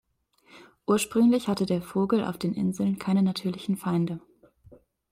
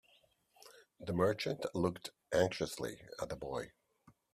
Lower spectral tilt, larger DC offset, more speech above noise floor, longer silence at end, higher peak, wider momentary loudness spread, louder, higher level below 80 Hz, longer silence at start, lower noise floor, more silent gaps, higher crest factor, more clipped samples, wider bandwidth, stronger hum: about the same, -6.5 dB/octave vs -5.5 dB/octave; neither; about the same, 37 dB vs 35 dB; first, 0.95 s vs 0.65 s; first, -12 dBFS vs -16 dBFS; second, 8 LU vs 15 LU; first, -26 LUFS vs -38 LUFS; about the same, -62 dBFS vs -66 dBFS; about the same, 0.55 s vs 0.65 s; second, -63 dBFS vs -71 dBFS; neither; second, 16 dB vs 22 dB; neither; about the same, 16 kHz vs 15 kHz; neither